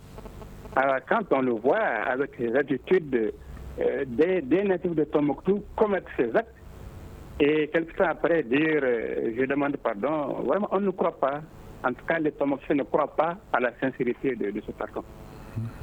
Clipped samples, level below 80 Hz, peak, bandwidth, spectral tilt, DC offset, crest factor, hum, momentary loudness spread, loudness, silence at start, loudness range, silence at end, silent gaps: under 0.1%; -50 dBFS; -8 dBFS; 8.8 kHz; -8 dB/octave; under 0.1%; 20 dB; none; 16 LU; -26 LUFS; 0 s; 2 LU; 0 s; none